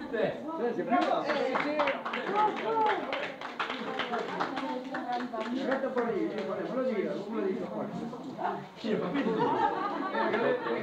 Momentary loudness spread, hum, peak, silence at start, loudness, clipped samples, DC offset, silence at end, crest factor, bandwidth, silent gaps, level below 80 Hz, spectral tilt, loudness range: 7 LU; none; -14 dBFS; 0 s; -31 LUFS; under 0.1%; under 0.1%; 0 s; 18 dB; 10 kHz; none; -72 dBFS; -6 dB/octave; 3 LU